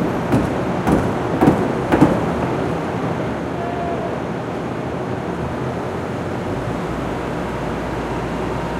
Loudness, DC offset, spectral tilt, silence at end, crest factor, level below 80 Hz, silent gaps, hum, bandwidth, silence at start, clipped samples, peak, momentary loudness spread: -21 LUFS; under 0.1%; -7.5 dB/octave; 0 s; 20 dB; -36 dBFS; none; none; 16 kHz; 0 s; under 0.1%; 0 dBFS; 9 LU